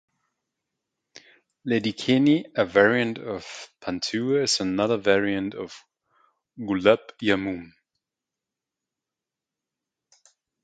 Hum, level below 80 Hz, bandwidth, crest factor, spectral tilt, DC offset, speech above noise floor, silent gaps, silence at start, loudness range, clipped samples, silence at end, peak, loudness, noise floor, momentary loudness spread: none; -60 dBFS; 9.4 kHz; 24 dB; -4.5 dB/octave; under 0.1%; 65 dB; none; 1.65 s; 5 LU; under 0.1%; 3 s; -2 dBFS; -23 LUFS; -88 dBFS; 16 LU